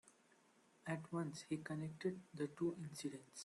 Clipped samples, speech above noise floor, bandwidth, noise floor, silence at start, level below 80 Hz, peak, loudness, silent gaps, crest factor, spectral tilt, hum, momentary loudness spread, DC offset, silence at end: under 0.1%; 27 dB; 12 kHz; -73 dBFS; 0.05 s; -84 dBFS; -30 dBFS; -47 LUFS; none; 18 dB; -6 dB/octave; none; 6 LU; under 0.1%; 0 s